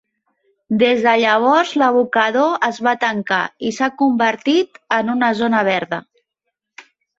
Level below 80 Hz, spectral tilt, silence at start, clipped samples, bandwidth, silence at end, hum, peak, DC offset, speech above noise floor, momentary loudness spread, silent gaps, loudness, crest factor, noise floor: -64 dBFS; -4.5 dB/octave; 0.7 s; under 0.1%; 7.8 kHz; 0.35 s; none; -2 dBFS; under 0.1%; 61 dB; 7 LU; none; -16 LUFS; 16 dB; -77 dBFS